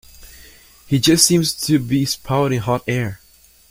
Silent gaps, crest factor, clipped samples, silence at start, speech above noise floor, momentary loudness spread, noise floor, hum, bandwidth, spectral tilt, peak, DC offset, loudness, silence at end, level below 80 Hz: none; 20 dB; under 0.1%; 0.2 s; 33 dB; 10 LU; -51 dBFS; none; 16.5 kHz; -4 dB/octave; 0 dBFS; under 0.1%; -17 LUFS; 0.55 s; -46 dBFS